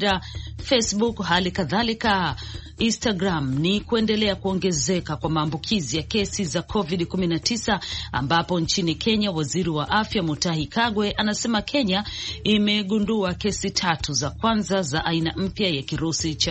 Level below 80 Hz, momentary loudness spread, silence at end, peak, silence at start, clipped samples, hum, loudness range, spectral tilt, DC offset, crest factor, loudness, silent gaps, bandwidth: -42 dBFS; 4 LU; 0 s; -6 dBFS; 0 s; under 0.1%; none; 1 LU; -4 dB/octave; under 0.1%; 18 dB; -23 LUFS; none; 8.4 kHz